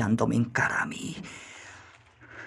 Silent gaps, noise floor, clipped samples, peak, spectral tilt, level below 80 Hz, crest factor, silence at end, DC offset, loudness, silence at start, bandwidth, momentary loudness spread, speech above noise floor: none; -53 dBFS; under 0.1%; -10 dBFS; -5.5 dB/octave; -62 dBFS; 20 dB; 0 s; under 0.1%; -27 LUFS; 0 s; 12 kHz; 22 LU; 26 dB